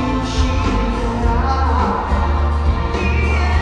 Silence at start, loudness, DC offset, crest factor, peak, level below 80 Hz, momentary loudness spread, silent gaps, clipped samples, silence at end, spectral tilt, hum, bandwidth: 0 s; -18 LUFS; under 0.1%; 12 dB; -4 dBFS; -18 dBFS; 2 LU; none; under 0.1%; 0 s; -6.5 dB/octave; none; 8.8 kHz